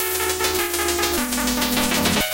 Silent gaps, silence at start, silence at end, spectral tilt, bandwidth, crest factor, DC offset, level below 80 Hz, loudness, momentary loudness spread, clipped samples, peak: none; 0 s; 0 s; -2 dB/octave; 17.5 kHz; 18 dB; under 0.1%; -38 dBFS; -20 LUFS; 2 LU; under 0.1%; -2 dBFS